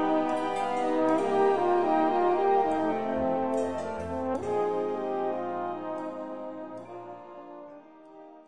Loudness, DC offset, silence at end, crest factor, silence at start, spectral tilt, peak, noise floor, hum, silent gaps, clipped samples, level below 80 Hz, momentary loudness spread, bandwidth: -28 LUFS; 0.3%; 0 s; 16 dB; 0 s; -6.5 dB/octave; -12 dBFS; -50 dBFS; none; none; under 0.1%; -62 dBFS; 18 LU; 10.5 kHz